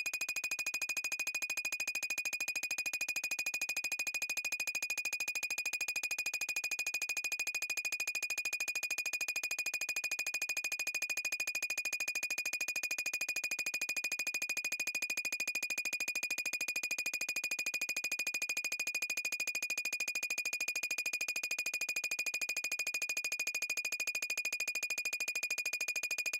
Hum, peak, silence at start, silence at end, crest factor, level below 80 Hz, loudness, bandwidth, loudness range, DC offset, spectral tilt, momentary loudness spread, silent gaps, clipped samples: none; -24 dBFS; 0 s; 0 s; 14 dB; -80 dBFS; -35 LUFS; 17 kHz; 0 LU; under 0.1%; 2.5 dB/octave; 1 LU; none; under 0.1%